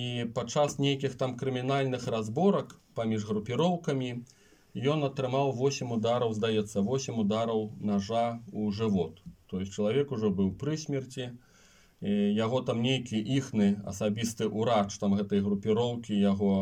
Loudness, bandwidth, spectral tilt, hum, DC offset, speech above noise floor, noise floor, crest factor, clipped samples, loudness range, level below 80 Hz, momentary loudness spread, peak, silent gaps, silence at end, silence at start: -30 LUFS; 12.5 kHz; -6 dB/octave; none; under 0.1%; 31 dB; -60 dBFS; 16 dB; under 0.1%; 2 LU; -66 dBFS; 7 LU; -14 dBFS; none; 0 s; 0 s